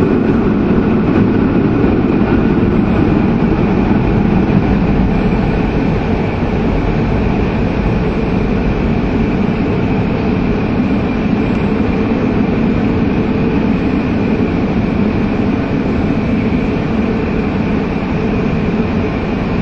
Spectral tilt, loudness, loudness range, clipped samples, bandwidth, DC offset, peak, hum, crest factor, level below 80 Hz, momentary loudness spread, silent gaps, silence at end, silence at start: -9 dB/octave; -14 LUFS; 3 LU; under 0.1%; 6.8 kHz; under 0.1%; 0 dBFS; none; 12 dB; -24 dBFS; 3 LU; none; 0 s; 0 s